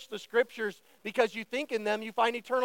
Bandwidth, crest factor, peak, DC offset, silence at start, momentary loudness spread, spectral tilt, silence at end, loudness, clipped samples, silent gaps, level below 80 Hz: 17 kHz; 18 dB; -12 dBFS; under 0.1%; 0 s; 8 LU; -3.5 dB/octave; 0 s; -31 LUFS; under 0.1%; none; -84 dBFS